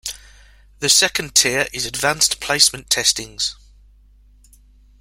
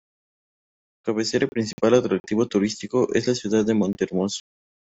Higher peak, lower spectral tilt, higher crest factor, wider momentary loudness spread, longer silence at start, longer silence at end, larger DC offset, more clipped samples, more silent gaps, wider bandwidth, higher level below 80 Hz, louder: first, 0 dBFS vs -4 dBFS; second, 0 dB/octave vs -5.5 dB/octave; about the same, 22 dB vs 20 dB; first, 10 LU vs 7 LU; second, 0.05 s vs 1.05 s; first, 1.45 s vs 0.55 s; neither; neither; second, none vs 1.73-1.78 s, 2.20-2.24 s; first, 16.5 kHz vs 8.2 kHz; first, -48 dBFS vs -60 dBFS; first, -16 LUFS vs -23 LUFS